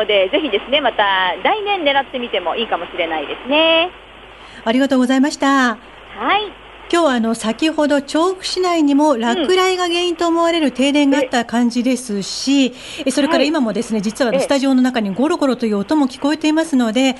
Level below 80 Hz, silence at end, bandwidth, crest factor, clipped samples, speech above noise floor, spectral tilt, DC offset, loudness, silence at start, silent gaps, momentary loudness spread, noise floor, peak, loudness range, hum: -52 dBFS; 0 s; 11.5 kHz; 14 dB; under 0.1%; 22 dB; -3.5 dB/octave; under 0.1%; -16 LUFS; 0 s; none; 6 LU; -38 dBFS; -2 dBFS; 2 LU; none